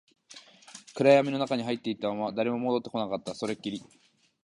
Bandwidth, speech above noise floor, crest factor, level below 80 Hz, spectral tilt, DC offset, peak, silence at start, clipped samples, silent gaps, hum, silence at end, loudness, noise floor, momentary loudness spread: 11 kHz; 25 dB; 22 dB; -72 dBFS; -5.5 dB/octave; under 0.1%; -8 dBFS; 0.3 s; under 0.1%; none; none; 0.6 s; -28 LUFS; -53 dBFS; 24 LU